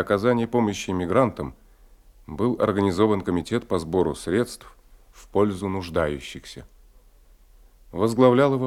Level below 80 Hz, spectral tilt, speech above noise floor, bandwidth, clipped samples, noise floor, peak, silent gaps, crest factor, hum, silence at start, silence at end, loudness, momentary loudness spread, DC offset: -50 dBFS; -6.5 dB/octave; 31 dB; 15.5 kHz; under 0.1%; -53 dBFS; -4 dBFS; none; 20 dB; none; 0 s; 0 s; -23 LUFS; 18 LU; under 0.1%